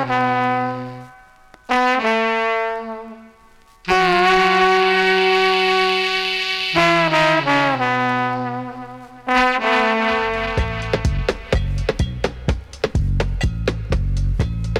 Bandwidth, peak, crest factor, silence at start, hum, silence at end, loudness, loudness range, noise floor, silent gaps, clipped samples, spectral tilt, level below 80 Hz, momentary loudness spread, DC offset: 15 kHz; -6 dBFS; 12 dB; 0 s; none; 0 s; -18 LUFS; 7 LU; -49 dBFS; none; under 0.1%; -5 dB/octave; -28 dBFS; 12 LU; under 0.1%